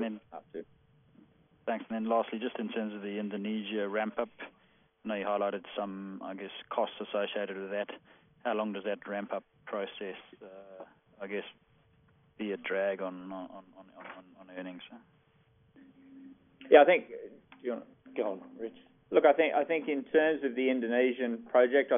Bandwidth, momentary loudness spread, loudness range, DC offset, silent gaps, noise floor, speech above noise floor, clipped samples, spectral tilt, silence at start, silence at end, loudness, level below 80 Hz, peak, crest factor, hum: 3.7 kHz; 23 LU; 12 LU; under 0.1%; none; -67 dBFS; 36 dB; under 0.1%; -0.5 dB/octave; 0 s; 0 s; -32 LUFS; -78 dBFS; -8 dBFS; 26 dB; none